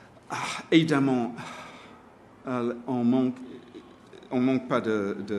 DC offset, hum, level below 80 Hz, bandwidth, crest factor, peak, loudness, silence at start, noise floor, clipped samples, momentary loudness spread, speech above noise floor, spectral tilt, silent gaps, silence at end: under 0.1%; none; -70 dBFS; 12 kHz; 22 dB; -6 dBFS; -27 LUFS; 0.3 s; -52 dBFS; under 0.1%; 20 LU; 27 dB; -6 dB/octave; none; 0 s